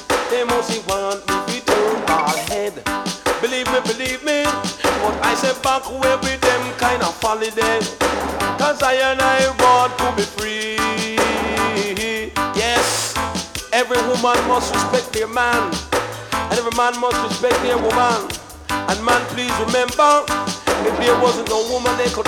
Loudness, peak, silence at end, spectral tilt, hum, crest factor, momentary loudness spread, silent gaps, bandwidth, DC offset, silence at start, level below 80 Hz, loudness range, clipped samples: -18 LUFS; -2 dBFS; 0 s; -3 dB/octave; none; 16 dB; 6 LU; none; 19.5 kHz; under 0.1%; 0 s; -40 dBFS; 3 LU; under 0.1%